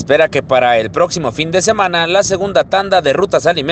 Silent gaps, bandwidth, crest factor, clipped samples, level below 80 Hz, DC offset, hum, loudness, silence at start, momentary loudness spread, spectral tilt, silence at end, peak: none; 9 kHz; 12 dB; under 0.1%; -44 dBFS; under 0.1%; none; -13 LUFS; 0 s; 3 LU; -3.5 dB/octave; 0 s; 0 dBFS